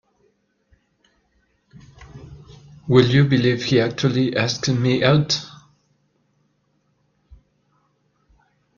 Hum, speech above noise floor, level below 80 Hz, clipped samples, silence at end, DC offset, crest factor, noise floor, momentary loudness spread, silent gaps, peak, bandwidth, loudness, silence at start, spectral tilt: none; 49 dB; -54 dBFS; under 0.1%; 3.3 s; under 0.1%; 22 dB; -66 dBFS; 26 LU; none; 0 dBFS; 7.2 kHz; -18 LUFS; 2 s; -6 dB/octave